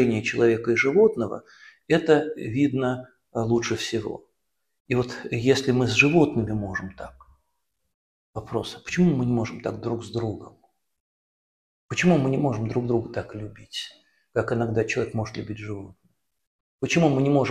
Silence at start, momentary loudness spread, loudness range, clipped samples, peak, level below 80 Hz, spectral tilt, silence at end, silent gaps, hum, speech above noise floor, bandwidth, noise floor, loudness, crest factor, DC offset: 0 s; 15 LU; 5 LU; under 0.1%; -2 dBFS; -54 dBFS; -6 dB/octave; 0 s; 4.80-4.85 s, 7.94-8.33 s, 11.00-11.89 s, 16.47-16.79 s; none; 56 dB; 12.5 kHz; -79 dBFS; -24 LUFS; 24 dB; under 0.1%